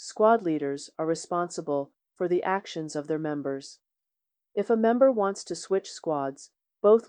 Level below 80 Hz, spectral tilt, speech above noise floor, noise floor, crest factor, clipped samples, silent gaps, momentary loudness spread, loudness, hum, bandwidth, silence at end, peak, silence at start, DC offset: -78 dBFS; -5.5 dB/octave; 60 dB; -87 dBFS; 18 dB; under 0.1%; none; 12 LU; -28 LUFS; none; 10 kHz; 0.05 s; -8 dBFS; 0 s; under 0.1%